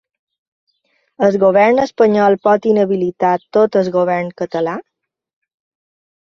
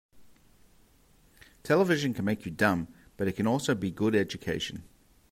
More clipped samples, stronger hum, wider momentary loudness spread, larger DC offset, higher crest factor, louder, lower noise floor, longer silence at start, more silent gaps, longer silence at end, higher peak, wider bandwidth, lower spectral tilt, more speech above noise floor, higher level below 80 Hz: neither; neither; about the same, 9 LU vs 10 LU; neither; second, 14 dB vs 20 dB; first, -14 LUFS vs -29 LUFS; first, -77 dBFS vs -62 dBFS; first, 1.2 s vs 0.15 s; neither; first, 1.5 s vs 0.5 s; first, -2 dBFS vs -10 dBFS; second, 7 kHz vs 16 kHz; first, -7 dB/octave vs -5.5 dB/octave; first, 64 dB vs 34 dB; about the same, -60 dBFS vs -60 dBFS